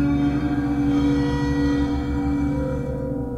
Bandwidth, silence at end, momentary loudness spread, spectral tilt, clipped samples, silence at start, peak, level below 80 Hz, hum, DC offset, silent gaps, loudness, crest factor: 8.2 kHz; 0 s; 6 LU; -8 dB/octave; under 0.1%; 0 s; -10 dBFS; -32 dBFS; none; under 0.1%; none; -22 LUFS; 10 dB